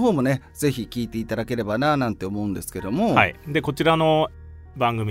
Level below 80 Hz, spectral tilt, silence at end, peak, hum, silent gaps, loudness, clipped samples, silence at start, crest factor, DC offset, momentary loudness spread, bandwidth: -46 dBFS; -6 dB/octave; 0 s; 0 dBFS; none; none; -23 LUFS; under 0.1%; 0 s; 22 dB; under 0.1%; 10 LU; 16 kHz